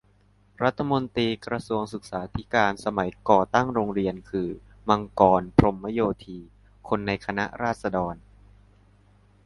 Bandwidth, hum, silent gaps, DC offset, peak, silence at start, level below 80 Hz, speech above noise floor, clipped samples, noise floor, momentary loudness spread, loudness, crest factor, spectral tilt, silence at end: 11.5 kHz; 50 Hz at -45 dBFS; none; under 0.1%; 0 dBFS; 0.6 s; -46 dBFS; 36 dB; under 0.1%; -60 dBFS; 13 LU; -25 LUFS; 26 dB; -7 dB/octave; 1.3 s